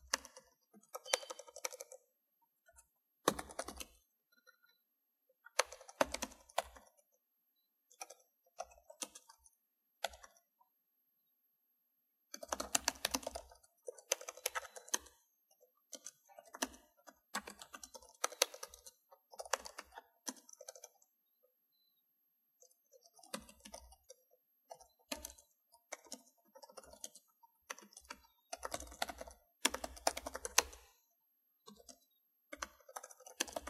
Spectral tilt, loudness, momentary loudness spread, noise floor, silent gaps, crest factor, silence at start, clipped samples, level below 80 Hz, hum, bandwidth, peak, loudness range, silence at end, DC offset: -0.5 dB/octave; -42 LUFS; 23 LU; -84 dBFS; none; 40 dB; 0.05 s; under 0.1%; -70 dBFS; none; 15.5 kHz; -8 dBFS; 14 LU; 0 s; under 0.1%